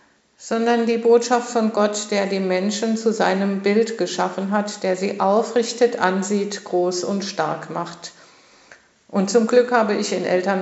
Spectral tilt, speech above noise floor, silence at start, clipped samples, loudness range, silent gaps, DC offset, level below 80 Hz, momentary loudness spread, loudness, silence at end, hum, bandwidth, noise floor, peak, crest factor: -4.5 dB/octave; 31 dB; 0.4 s; under 0.1%; 4 LU; none; under 0.1%; -76 dBFS; 8 LU; -20 LUFS; 0 s; none; 8.2 kHz; -50 dBFS; -2 dBFS; 18 dB